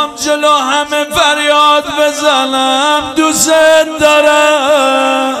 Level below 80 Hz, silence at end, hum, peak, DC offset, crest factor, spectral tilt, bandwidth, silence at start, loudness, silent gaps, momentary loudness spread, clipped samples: -46 dBFS; 0 s; none; 0 dBFS; under 0.1%; 10 dB; -1.5 dB/octave; 16 kHz; 0 s; -9 LUFS; none; 5 LU; 0.4%